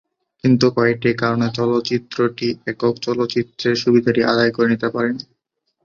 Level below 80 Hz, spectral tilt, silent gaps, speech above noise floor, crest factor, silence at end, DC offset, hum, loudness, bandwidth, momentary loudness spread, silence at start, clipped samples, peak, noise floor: -56 dBFS; -6.5 dB/octave; none; 54 dB; 16 dB; 0.6 s; under 0.1%; none; -18 LUFS; 7.2 kHz; 7 LU; 0.45 s; under 0.1%; -2 dBFS; -72 dBFS